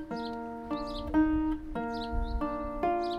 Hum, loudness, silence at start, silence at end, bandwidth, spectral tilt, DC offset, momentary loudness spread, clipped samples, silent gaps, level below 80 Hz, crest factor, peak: none; -33 LUFS; 0 s; 0 s; 8.6 kHz; -7.5 dB/octave; under 0.1%; 9 LU; under 0.1%; none; -40 dBFS; 16 dB; -16 dBFS